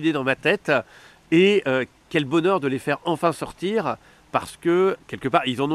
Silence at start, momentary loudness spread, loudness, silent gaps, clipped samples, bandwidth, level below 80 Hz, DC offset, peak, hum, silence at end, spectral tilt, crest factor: 0 s; 9 LU; -22 LUFS; none; under 0.1%; 13.5 kHz; -58 dBFS; under 0.1%; -4 dBFS; none; 0 s; -6 dB/octave; 18 dB